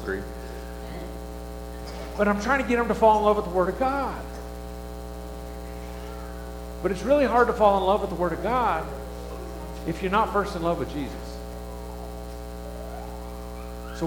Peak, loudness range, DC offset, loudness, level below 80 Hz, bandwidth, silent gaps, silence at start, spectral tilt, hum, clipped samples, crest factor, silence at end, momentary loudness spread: -6 dBFS; 9 LU; under 0.1%; -25 LUFS; -38 dBFS; 19 kHz; none; 0 s; -6 dB/octave; 60 Hz at -40 dBFS; under 0.1%; 20 dB; 0 s; 17 LU